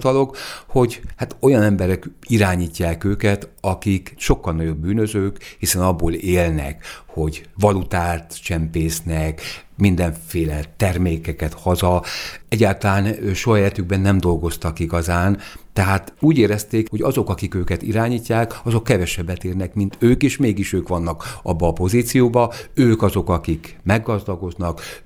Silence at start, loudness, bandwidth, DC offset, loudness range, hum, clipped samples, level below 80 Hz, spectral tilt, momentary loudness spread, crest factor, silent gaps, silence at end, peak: 0 s; -20 LUFS; 20 kHz; under 0.1%; 3 LU; none; under 0.1%; -34 dBFS; -6 dB/octave; 9 LU; 18 dB; none; 0.05 s; 0 dBFS